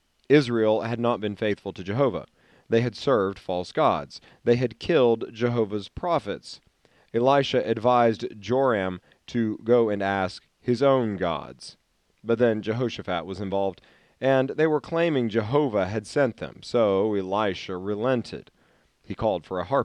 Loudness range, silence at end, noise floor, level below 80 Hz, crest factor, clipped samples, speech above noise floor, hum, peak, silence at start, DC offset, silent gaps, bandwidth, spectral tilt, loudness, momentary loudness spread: 2 LU; 0 s; -63 dBFS; -60 dBFS; 18 dB; under 0.1%; 39 dB; none; -6 dBFS; 0.3 s; under 0.1%; none; 10 kHz; -7 dB/octave; -25 LUFS; 11 LU